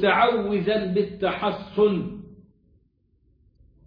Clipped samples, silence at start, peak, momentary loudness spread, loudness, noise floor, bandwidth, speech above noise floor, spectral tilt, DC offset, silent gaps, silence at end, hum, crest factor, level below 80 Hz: under 0.1%; 0 s; -6 dBFS; 9 LU; -23 LUFS; -65 dBFS; 5.2 kHz; 42 dB; -9 dB/octave; under 0.1%; none; 1.5 s; none; 18 dB; -54 dBFS